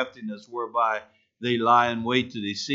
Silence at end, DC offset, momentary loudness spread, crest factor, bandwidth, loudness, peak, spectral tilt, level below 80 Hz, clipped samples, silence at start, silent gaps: 0 s; under 0.1%; 13 LU; 20 dB; 7.8 kHz; -25 LUFS; -6 dBFS; -4.5 dB/octave; -68 dBFS; under 0.1%; 0 s; none